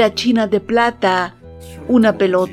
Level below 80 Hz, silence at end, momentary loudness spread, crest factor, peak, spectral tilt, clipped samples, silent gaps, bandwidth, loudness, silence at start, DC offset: -46 dBFS; 0 s; 12 LU; 14 dB; 0 dBFS; -5.5 dB/octave; under 0.1%; none; 13 kHz; -16 LUFS; 0 s; under 0.1%